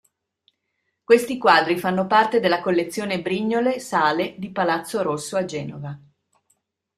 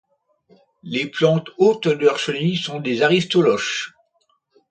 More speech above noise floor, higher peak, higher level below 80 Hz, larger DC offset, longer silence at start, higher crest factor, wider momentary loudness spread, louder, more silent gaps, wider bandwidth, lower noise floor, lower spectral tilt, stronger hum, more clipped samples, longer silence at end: first, 55 dB vs 47 dB; about the same, -2 dBFS vs -2 dBFS; about the same, -66 dBFS vs -64 dBFS; neither; first, 1.1 s vs 0.85 s; about the same, 20 dB vs 18 dB; first, 12 LU vs 9 LU; about the same, -21 LUFS vs -19 LUFS; neither; first, 15 kHz vs 9.2 kHz; first, -76 dBFS vs -66 dBFS; about the same, -5 dB/octave vs -5 dB/octave; neither; neither; first, 1 s vs 0.8 s